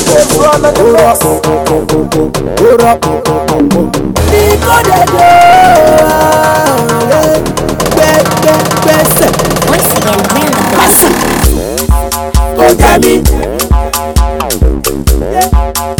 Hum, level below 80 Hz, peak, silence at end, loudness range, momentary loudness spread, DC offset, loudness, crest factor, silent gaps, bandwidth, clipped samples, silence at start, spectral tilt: none; -16 dBFS; 0 dBFS; 0 s; 3 LU; 7 LU; under 0.1%; -7 LUFS; 8 dB; none; over 20 kHz; 3%; 0 s; -4.5 dB/octave